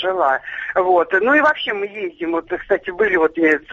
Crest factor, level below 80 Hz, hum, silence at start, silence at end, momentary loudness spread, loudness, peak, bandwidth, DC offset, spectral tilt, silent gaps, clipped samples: 14 dB; -54 dBFS; none; 0 s; 0 s; 9 LU; -18 LUFS; -4 dBFS; 7.4 kHz; under 0.1%; -5.5 dB/octave; none; under 0.1%